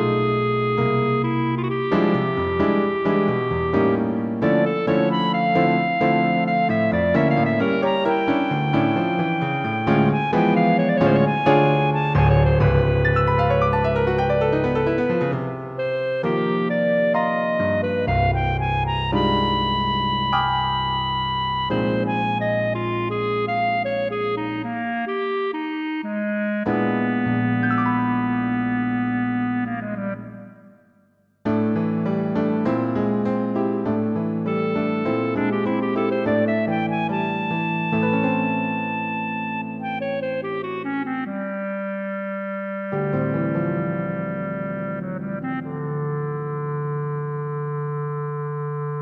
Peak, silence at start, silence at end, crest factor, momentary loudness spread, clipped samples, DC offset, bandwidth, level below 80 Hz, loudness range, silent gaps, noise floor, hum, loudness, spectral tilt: -4 dBFS; 0 s; 0 s; 16 dB; 9 LU; under 0.1%; under 0.1%; 6.4 kHz; -40 dBFS; 7 LU; none; -60 dBFS; none; -22 LUFS; -9 dB/octave